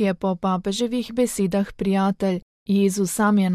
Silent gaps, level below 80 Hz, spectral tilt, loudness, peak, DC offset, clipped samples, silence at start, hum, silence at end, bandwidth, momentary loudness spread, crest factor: 2.42-2.66 s; -50 dBFS; -6 dB/octave; -22 LUFS; -8 dBFS; under 0.1%; under 0.1%; 0 s; none; 0 s; 15 kHz; 5 LU; 12 dB